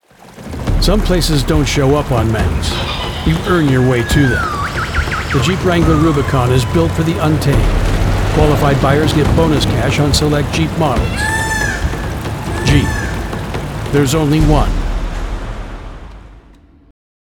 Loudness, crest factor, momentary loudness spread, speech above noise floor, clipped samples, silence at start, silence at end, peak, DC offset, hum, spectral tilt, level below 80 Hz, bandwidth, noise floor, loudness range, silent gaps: -14 LUFS; 14 dB; 10 LU; 31 dB; under 0.1%; 0.25 s; 0.9 s; 0 dBFS; under 0.1%; none; -5.5 dB/octave; -20 dBFS; 19 kHz; -43 dBFS; 4 LU; none